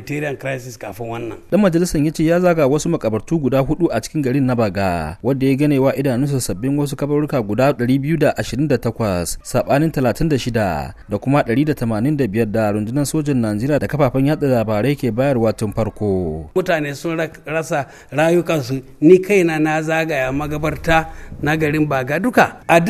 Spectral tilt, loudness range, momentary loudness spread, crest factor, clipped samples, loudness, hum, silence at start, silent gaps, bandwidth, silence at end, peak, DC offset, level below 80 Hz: -6.5 dB/octave; 2 LU; 8 LU; 18 dB; under 0.1%; -18 LUFS; none; 0 s; none; 14 kHz; 0 s; 0 dBFS; under 0.1%; -38 dBFS